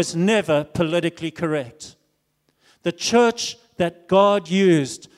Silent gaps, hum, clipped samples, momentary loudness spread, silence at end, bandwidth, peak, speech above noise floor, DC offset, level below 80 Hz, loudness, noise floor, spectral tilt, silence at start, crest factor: none; none; under 0.1%; 11 LU; 0.2 s; 14 kHz; -4 dBFS; 49 dB; under 0.1%; -58 dBFS; -20 LUFS; -69 dBFS; -5 dB/octave; 0 s; 16 dB